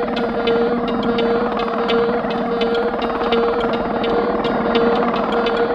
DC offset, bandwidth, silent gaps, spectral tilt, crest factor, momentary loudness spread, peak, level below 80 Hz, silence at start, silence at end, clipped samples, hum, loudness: under 0.1%; 6.8 kHz; none; -7 dB/octave; 16 dB; 3 LU; -2 dBFS; -42 dBFS; 0 s; 0 s; under 0.1%; none; -18 LUFS